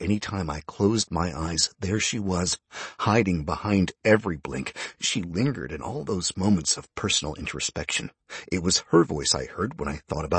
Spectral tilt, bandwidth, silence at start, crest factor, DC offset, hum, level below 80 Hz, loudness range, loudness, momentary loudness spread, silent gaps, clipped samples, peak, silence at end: -4 dB/octave; 8.8 kHz; 0 s; 22 dB; under 0.1%; none; -46 dBFS; 2 LU; -26 LUFS; 10 LU; none; under 0.1%; -4 dBFS; 0 s